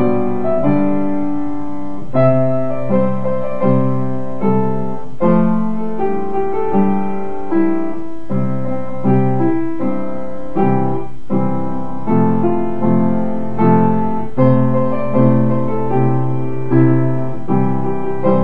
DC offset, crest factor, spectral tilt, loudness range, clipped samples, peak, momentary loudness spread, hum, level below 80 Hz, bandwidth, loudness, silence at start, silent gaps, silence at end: 10%; 16 dB; -11 dB/octave; 3 LU; under 0.1%; 0 dBFS; 9 LU; none; -42 dBFS; 4.3 kHz; -17 LUFS; 0 s; none; 0 s